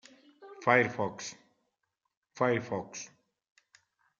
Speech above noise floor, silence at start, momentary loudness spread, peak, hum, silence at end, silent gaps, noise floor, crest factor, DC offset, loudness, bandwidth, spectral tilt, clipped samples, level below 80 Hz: 53 dB; 0.4 s; 19 LU; -8 dBFS; none; 1.15 s; 2.17-2.22 s; -83 dBFS; 26 dB; under 0.1%; -30 LUFS; 7.8 kHz; -5 dB/octave; under 0.1%; -78 dBFS